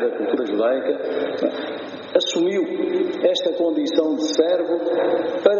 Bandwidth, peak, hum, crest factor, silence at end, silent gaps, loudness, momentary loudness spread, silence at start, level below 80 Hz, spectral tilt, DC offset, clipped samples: 7.2 kHz; 0 dBFS; none; 20 dB; 0 s; none; -21 LUFS; 5 LU; 0 s; -70 dBFS; -2.5 dB/octave; under 0.1%; under 0.1%